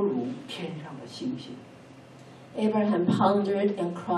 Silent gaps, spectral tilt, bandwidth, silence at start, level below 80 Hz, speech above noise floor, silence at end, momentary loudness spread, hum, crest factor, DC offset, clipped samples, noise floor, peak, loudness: none; -7.5 dB/octave; 11 kHz; 0 s; -74 dBFS; 23 dB; 0 s; 21 LU; none; 18 dB; under 0.1%; under 0.1%; -49 dBFS; -10 dBFS; -27 LUFS